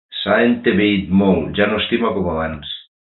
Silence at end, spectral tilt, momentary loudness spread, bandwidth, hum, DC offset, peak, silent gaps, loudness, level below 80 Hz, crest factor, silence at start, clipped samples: 0.35 s; -11.5 dB/octave; 11 LU; 4.3 kHz; none; under 0.1%; -2 dBFS; none; -17 LUFS; -40 dBFS; 16 dB; 0.1 s; under 0.1%